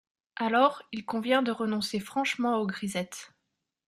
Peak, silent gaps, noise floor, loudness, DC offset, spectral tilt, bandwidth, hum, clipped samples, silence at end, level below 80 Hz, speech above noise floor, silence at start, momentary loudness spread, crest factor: -10 dBFS; none; -82 dBFS; -29 LUFS; under 0.1%; -4.5 dB/octave; 14 kHz; none; under 0.1%; 0.6 s; -72 dBFS; 54 dB; 0.35 s; 14 LU; 20 dB